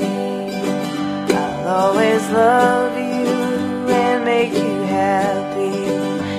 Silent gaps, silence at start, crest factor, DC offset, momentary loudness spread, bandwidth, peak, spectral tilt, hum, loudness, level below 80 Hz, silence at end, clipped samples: none; 0 s; 16 dB; under 0.1%; 7 LU; 15.5 kHz; -2 dBFS; -5.5 dB/octave; none; -18 LUFS; -56 dBFS; 0 s; under 0.1%